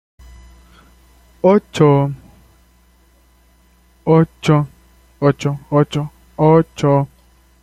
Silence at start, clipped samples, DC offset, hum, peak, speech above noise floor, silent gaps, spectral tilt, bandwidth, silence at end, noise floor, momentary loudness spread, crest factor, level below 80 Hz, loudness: 1.45 s; under 0.1%; under 0.1%; 60 Hz at -50 dBFS; -2 dBFS; 38 dB; none; -8 dB/octave; 9.6 kHz; 0.55 s; -52 dBFS; 13 LU; 16 dB; -46 dBFS; -16 LUFS